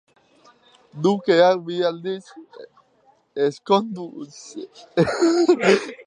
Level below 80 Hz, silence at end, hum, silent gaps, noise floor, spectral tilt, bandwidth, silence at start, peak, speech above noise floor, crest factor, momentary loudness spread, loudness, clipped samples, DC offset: -62 dBFS; 0.05 s; none; none; -60 dBFS; -5.5 dB/octave; 10 kHz; 0.95 s; -4 dBFS; 39 dB; 18 dB; 20 LU; -20 LUFS; under 0.1%; under 0.1%